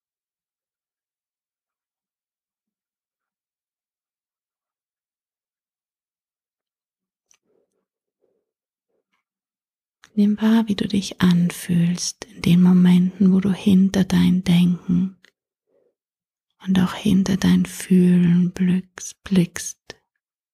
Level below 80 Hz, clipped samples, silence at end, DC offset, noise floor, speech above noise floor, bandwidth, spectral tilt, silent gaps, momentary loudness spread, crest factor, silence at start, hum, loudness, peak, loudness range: -52 dBFS; under 0.1%; 0.8 s; under 0.1%; under -90 dBFS; over 72 dB; 13.5 kHz; -6.5 dB/octave; none; 11 LU; 18 dB; 10.15 s; none; -19 LUFS; -4 dBFS; 7 LU